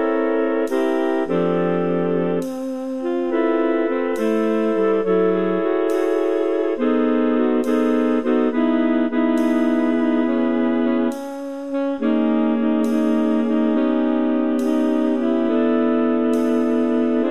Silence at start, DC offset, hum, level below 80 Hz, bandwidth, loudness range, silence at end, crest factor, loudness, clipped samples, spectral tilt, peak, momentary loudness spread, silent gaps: 0 s; 1%; none; -64 dBFS; 12.5 kHz; 2 LU; 0 s; 12 dB; -19 LUFS; under 0.1%; -7 dB/octave; -8 dBFS; 3 LU; none